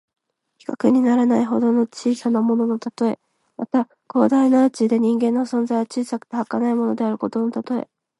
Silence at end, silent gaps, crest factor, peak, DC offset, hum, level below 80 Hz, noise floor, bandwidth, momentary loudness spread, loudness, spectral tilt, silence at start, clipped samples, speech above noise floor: 0.4 s; none; 18 dB; -2 dBFS; under 0.1%; none; -72 dBFS; -58 dBFS; 11.5 kHz; 10 LU; -20 LUFS; -6.5 dB/octave; 0.7 s; under 0.1%; 39 dB